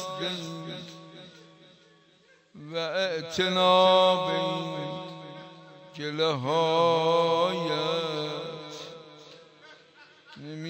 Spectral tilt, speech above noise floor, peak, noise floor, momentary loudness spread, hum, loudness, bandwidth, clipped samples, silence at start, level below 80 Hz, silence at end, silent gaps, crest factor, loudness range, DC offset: -4.5 dB/octave; 35 dB; -8 dBFS; -61 dBFS; 24 LU; none; -26 LUFS; 15.5 kHz; under 0.1%; 0 s; -74 dBFS; 0 s; none; 20 dB; 8 LU; under 0.1%